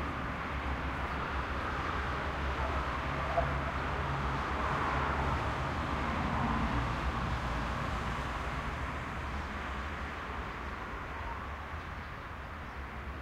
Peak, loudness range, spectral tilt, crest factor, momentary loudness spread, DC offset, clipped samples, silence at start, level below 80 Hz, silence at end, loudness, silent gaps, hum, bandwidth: -18 dBFS; 6 LU; -6 dB/octave; 16 dB; 9 LU; under 0.1%; under 0.1%; 0 s; -40 dBFS; 0 s; -36 LUFS; none; none; 12.5 kHz